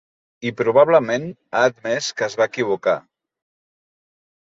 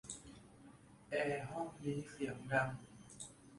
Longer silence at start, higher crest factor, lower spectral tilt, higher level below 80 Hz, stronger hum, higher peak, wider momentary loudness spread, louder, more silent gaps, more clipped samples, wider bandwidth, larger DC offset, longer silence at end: first, 0.4 s vs 0.05 s; about the same, 20 dB vs 22 dB; about the same, -4.5 dB/octave vs -5 dB/octave; about the same, -66 dBFS vs -70 dBFS; neither; first, -2 dBFS vs -20 dBFS; second, 11 LU vs 23 LU; first, -20 LUFS vs -42 LUFS; neither; neither; second, 8 kHz vs 11.5 kHz; neither; first, 1.55 s vs 0 s